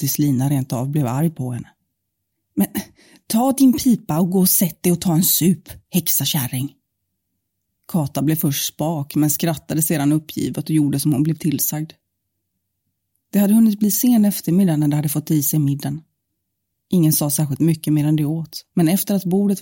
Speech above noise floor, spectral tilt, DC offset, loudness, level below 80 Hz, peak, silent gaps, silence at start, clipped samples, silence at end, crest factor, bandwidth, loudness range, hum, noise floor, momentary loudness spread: 58 dB; -5.5 dB/octave; under 0.1%; -18 LUFS; -56 dBFS; -4 dBFS; none; 0 s; under 0.1%; 0 s; 16 dB; 17 kHz; 5 LU; none; -76 dBFS; 10 LU